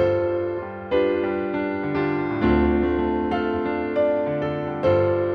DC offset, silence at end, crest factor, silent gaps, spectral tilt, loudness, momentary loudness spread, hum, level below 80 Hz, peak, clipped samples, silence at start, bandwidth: under 0.1%; 0 s; 14 dB; none; -9.5 dB/octave; -23 LUFS; 6 LU; none; -38 dBFS; -8 dBFS; under 0.1%; 0 s; 5.4 kHz